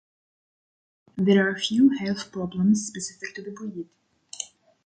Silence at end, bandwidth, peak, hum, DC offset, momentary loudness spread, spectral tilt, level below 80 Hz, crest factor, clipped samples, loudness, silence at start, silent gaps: 0.4 s; 9.4 kHz; -8 dBFS; none; under 0.1%; 18 LU; -5 dB/octave; -64 dBFS; 18 dB; under 0.1%; -23 LUFS; 1.15 s; none